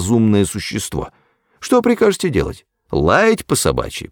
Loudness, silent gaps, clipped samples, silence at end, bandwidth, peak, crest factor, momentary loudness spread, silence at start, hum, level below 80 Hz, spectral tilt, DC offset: -16 LUFS; none; under 0.1%; 0.05 s; 19.5 kHz; -2 dBFS; 16 dB; 13 LU; 0 s; none; -36 dBFS; -5 dB/octave; under 0.1%